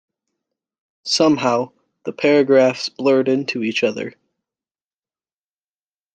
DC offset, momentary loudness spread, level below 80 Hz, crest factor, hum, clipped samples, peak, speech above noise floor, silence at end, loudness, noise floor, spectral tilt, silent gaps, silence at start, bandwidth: under 0.1%; 17 LU; -66 dBFS; 18 dB; none; under 0.1%; -2 dBFS; over 73 dB; 2.05 s; -17 LUFS; under -90 dBFS; -4.5 dB/octave; none; 1.05 s; 9.2 kHz